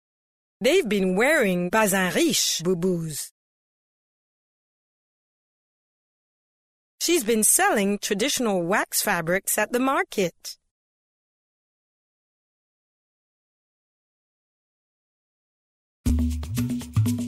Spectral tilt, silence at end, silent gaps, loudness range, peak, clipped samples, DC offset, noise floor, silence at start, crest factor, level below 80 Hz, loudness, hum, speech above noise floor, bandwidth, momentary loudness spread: -3.5 dB/octave; 0 s; 3.31-6.98 s, 10.71-16.04 s; 12 LU; -6 dBFS; under 0.1%; under 0.1%; under -90 dBFS; 0.6 s; 20 dB; -42 dBFS; -22 LUFS; none; over 68 dB; 16 kHz; 9 LU